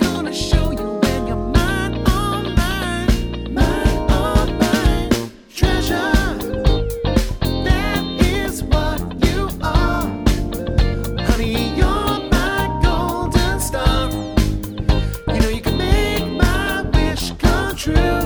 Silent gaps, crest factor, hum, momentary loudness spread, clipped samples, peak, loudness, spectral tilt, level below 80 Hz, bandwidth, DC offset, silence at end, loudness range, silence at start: none; 16 dB; none; 4 LU; under 0.1%; 0 dBFS; -19 LUFS; -5.5 dB/octave; -22 dBFS; over 20 kHz; under 0.1%; 0 s; 1 LU; 0 s